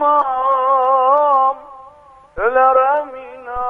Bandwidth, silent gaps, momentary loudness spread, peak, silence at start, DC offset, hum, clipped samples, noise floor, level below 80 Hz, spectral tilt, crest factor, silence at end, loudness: 3.8 kHz; none; 18 LU; -2 dBFS; 0 s; under 0.1%; none; under 0.1%; -44 dBFS; -48 dBFS; -6 dB/octave; 14 dB; 0 s; -14 LUFS